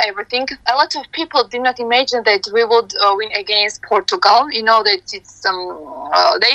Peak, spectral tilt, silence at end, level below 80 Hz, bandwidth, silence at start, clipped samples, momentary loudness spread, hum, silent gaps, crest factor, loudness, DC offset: 0 dBFS; -1 dB/octave; 0 s; -58 dBFS; 8.8 kHz; 0 s; under 0.1%; 8 LU; none; none; 16 dB; -15 LUFS; under 0.1%